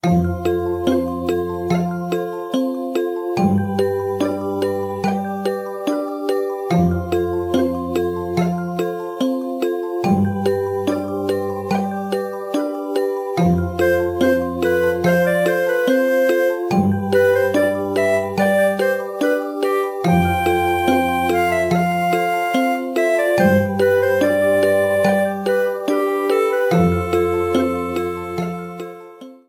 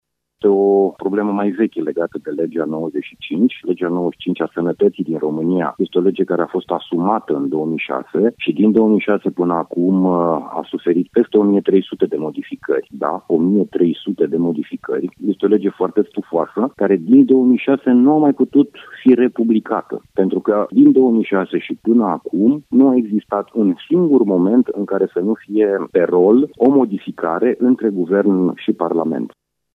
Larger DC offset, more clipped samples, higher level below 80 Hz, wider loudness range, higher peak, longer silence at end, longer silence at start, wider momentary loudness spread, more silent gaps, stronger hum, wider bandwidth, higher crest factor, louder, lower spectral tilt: neither; neither; first, -46 dBFS vs -64 dBFS; about the same, 4 LU vs 5 LU; about the same, -4 dBFS vs -2 dBFS; second, 0.15 s vs 0.45 s; second, 0.05 s vs 0.45 s; about the same, 7 LU vs 9 LU; neither; neither; first, 17 kHz vs 3.9 kHz; about the same, 14 dB vs 14 dB; second, -19 LUFS vs -16 LUFS; second, -6.5 dB/octave vs -9.5 dB/octave